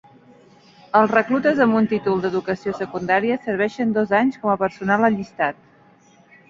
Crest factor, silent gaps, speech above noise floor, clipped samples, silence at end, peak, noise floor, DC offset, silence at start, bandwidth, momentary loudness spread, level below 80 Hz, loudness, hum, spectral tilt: 20 dB; none; 33 dB; under 0.1%; 0.95 s; -2 dBFS; -53 dBFS; under 0.1%; 0.95 s; 7.4 kHz; 8 LU; -60 dBFS; -20 LUFS; none; -7 dB/octave